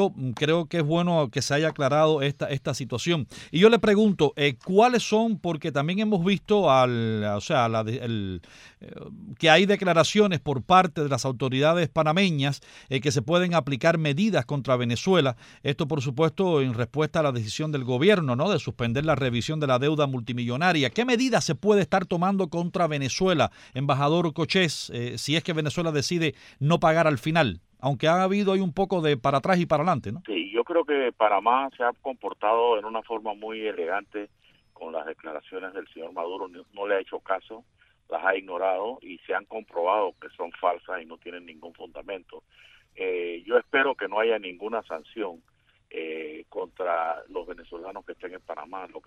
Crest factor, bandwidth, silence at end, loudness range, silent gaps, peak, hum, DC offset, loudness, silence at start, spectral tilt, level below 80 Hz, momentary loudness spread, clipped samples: 22 dB; 14.5 kHz; 0.05 s; 11 LU; none; -2 dBFS; none; under 0.1%; -24 LUFS; 0 s; -5.5 dB/octave; -58 dBFS; 16 LU; under 0.1%